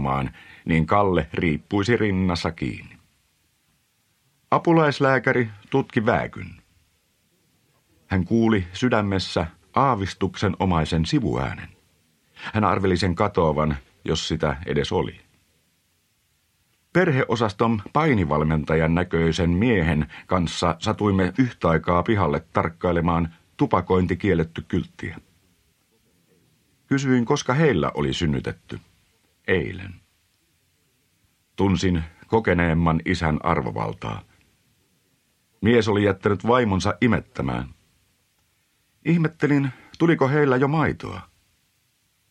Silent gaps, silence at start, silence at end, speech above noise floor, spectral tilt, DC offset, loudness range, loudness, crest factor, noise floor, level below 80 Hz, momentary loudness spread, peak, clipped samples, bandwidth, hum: none; 0 s; 1.05 s; 46 dB; -6.5 dB/octave; under 0.1%; 5 LU; -22 LUFS; 22 dB; -67 dBFS; -42 dBFS; 11 LU; -2 dBFS; under 0.1%; 10 kHz; none